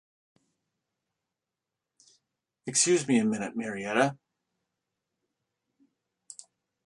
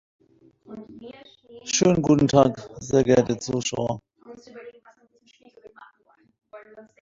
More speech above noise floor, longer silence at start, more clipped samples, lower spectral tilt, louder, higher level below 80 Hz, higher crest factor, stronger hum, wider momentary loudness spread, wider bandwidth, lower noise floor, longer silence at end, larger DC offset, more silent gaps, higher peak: first, 62 dB vs 40 dB; first, 2.65 s vs 0.7 s; neither; second, -3.5 dB/octave vs -5 dB/octave; second, -27 LUFS vs -21 LUFS; second, -76 dBFS vs -54 dBFS; about the same, 24 dB vs 22 dB; neither; about the same, 24 LU vs 25 LU; first, 11.5 kHz vs 7.8 kHz; first, -88 dBFS vs -62 dBFS; first, 0.5 s vs 0.2 s; neither; neither; second, -10 dBFS vs -2 dBFS